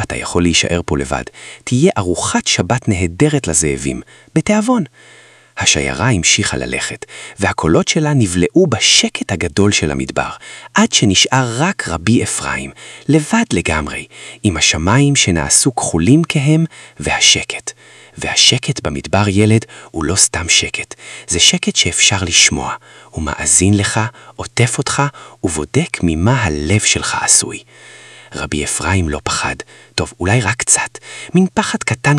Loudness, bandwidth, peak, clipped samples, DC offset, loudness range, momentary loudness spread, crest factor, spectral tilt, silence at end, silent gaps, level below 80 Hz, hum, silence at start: -14 LUFS; 12 kHz; 0 dBFS; 0.1%; under 0.1%; 4 LU; 14 LU; 16 dB; -3.5 dB/octave; 0 s; none; -38 dBFS; none; 0 s